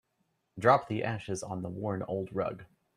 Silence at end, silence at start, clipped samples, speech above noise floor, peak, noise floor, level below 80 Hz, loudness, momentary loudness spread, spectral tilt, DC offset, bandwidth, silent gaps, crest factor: 0.3 s; 0.55 s; under 0.1%; 47 dB; -8 dBFS; -78 dBFS; -66 dBFS; -32 LUFS; 12 LU; -6 dB/octave; under 0.1%; 13.5 kHz; none; 24 dB